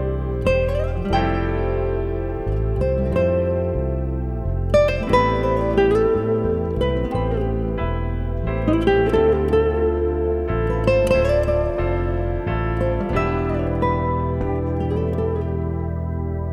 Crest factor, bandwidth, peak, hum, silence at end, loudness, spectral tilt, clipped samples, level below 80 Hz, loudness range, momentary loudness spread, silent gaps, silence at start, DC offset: 16 dB; 11 kHz; -4 dBFS; none; 0 s; -21 LUFS; -8.5 dB/octave; under 0.1%; -28 dBFS; 3 LU; 7 LU; none; 0 s; under 0.1%